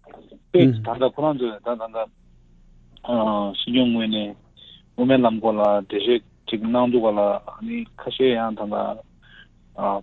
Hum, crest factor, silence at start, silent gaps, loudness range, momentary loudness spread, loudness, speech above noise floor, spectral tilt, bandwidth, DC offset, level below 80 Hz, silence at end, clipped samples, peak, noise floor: none; 20 dB; 0.15 s; none; 4 LU; 13 LU; -22 LUFS; 31 dB; -9 dB/octave; 4.3 kHz; under 0.1%; -54 dBFS; 0 s; under 0.1%; -2 dBFS; -52 dBFS